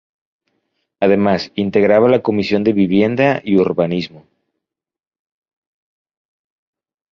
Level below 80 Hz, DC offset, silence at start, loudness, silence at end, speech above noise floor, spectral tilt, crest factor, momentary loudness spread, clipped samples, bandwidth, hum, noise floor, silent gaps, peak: -52 dBFS; under 0.1%; 1 s; -15 LUFS; 2.95 s; 71 dB; -8 dB/octave; 16 dB; 7 LU; under 0.1%; 6.8 kHz; none; -85 dBFS; none; 0 dBFS